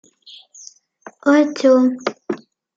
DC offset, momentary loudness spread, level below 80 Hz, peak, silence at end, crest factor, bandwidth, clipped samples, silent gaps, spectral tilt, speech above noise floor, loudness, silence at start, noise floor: under 0.1%; 15 LU; -76 dBFS; -2 dBFS; 0.4 s; 16 dB; 7.8 kHz; under 0.1%; none; -4.5 dB/octave; 30 dB; -16 LUFS; 1.25 s; -45 dBFS